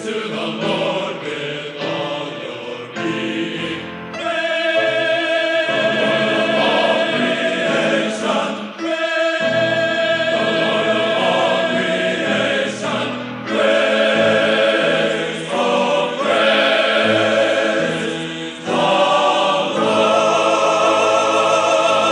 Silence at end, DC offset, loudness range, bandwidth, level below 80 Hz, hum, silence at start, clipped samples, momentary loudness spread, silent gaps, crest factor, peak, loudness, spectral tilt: 0 s; under 0.1%; 6 LU; 11 kHz; -64 dBFS; none; 0 s; under 0.1%; 10 LU; none; 14 dB; -2 dBFS; -17 LUFS; -3.5 dB/octave